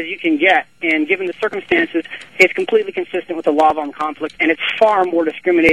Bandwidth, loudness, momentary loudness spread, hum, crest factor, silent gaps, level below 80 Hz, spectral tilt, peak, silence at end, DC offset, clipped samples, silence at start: 12.5 kHz; -16 LUFS; 10 LU; none; 16 dB; none; -56 dBFS; -4.5 dB/octave; 0 dBFS; 0 s; 0.3%; under 0.1%; 0 s